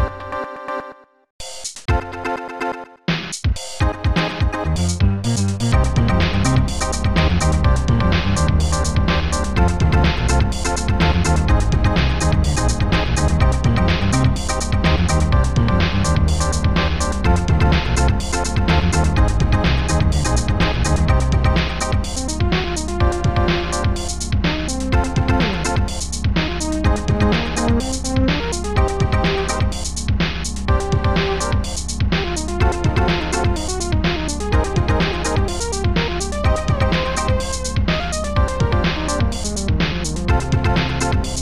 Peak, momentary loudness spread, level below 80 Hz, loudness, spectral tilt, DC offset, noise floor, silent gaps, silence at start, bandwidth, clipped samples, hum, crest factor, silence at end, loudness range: -2 dBFS; 5 LU; -22 dBFS; -19 LUFS; -5 dB/octave; under 0.1%; -39 dBFS; 1.30-1.39 s; 0 s; 12.5 kHz; under 0.1%; none; 14 dB; 0 s; 3 LU